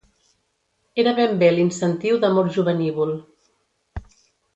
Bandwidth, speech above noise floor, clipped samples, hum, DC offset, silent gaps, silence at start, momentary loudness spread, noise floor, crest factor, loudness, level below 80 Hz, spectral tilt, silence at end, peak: 8.2 kHz; 51 dB; under 0.1%; none; under 0.1%; none; 0.95 s; 22 LU; -70 dBFS; 18 dB; -20 LUFS; -50 dBFS; -6.5 dB/octave; 0.55 s; -4 dBFS